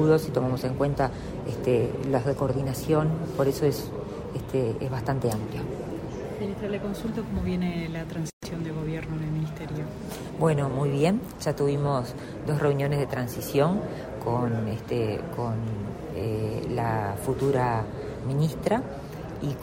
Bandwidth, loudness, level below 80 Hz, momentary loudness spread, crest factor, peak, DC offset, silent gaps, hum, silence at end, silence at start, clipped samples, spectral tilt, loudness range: 16 kHz; -28 LUFS; -46 dBFS; 10 LU; 18 dB; -8 dBFS; under 0.1%; 8.33-8.41 s; none; 0 s; 0 s; under 0.1%; -7 dB/octave; 5 LU